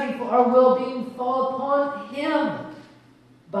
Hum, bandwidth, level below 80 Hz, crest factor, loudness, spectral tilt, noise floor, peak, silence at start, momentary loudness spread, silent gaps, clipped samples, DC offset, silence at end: none; 9 kHz; -70 dBFS; 18 dB; -22 LUFS; -7 dB/octave; -53 dBFS; -4 dBFS; 0 s; 13 LU; none; under 0.1%; under 0.1%; 0 s